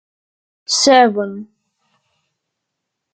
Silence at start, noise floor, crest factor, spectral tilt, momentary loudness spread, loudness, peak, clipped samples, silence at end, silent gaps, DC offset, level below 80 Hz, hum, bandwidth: 0.7 s; -78 dBFS; 18 dB; -2 dB/octave; 23 LU; -13 LUFS; 0 dBFS; under 0.1%; 1.7 s; none; under 0.1%; -70 dBFS; none; 9.4 kHz